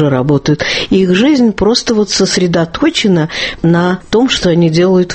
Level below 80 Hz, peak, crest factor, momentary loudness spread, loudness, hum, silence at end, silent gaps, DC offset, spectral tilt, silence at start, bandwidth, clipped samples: -36 dBFS; 0 dBFS; 10 dB; 3 LU; -11 LUFS; none; 0 s; none; under 0.1%; -5 dB/octave; 0 s; 8.8 kHz; under 0.1%